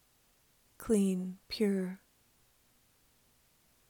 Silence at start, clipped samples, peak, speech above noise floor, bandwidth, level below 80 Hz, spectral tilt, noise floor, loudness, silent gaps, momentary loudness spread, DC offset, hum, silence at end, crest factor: 0.8 s; under 0.1%; -18 dBFS; 37 dB; 18.5 kHz; -66 dBFS; -6 dB/octave; -70 dBFS; -33 LUFS; none; 15 LU; under 0.1%; none; 1.95 s; 20 dB